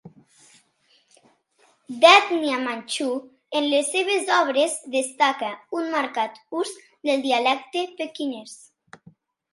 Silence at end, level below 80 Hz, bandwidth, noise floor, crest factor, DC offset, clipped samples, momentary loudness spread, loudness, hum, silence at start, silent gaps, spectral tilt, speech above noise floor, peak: 1 s; -80 dBFS; 11.5 kHz; -63 dBFS; 24 dB; under 0.1%; under 0.1%; 14 LU; -22 LUFS; none; 0.05 s; none; -1.5 dB/octave; 41 dB; 0 dBFS